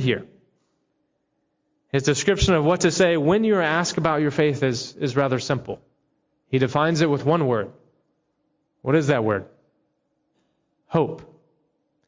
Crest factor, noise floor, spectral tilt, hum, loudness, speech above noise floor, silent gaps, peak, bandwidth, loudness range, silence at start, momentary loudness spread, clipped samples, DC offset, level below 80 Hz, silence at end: 16 dB; -73 dBFS; -5.5 dB/octave; none; -21 LUFS; 52 dB; none; -6 dBFS; 7.8 kHz; 6 LU; 0 s; 9 LU; under 0.1%; under 0.1%; -44 dBFS; 0.85 s